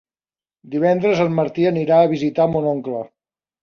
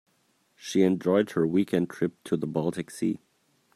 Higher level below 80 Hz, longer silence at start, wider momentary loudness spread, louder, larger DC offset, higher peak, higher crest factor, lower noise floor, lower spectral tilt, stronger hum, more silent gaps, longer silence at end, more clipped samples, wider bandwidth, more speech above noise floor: first, -58 dBFS vs -68 dBFS; about the same, 0.65 s vs 0.6 s; first, 12 LU vs 8 LU; first, -18 LUFS vs -27 LUFS; neither; first, -4 dBFS vs -10 dBFS; about the same, 16 dB vs 18 dB; first, under -90 dBFS vs -69 dBFS; first, -8 dB/octave vs -6.5 dB/octave; neither; neither; about the same, 0.55 s vs 0.6 s; neither; second, 7 kHz vs 13.5 kHz; first, over 73 dB vs 43 dB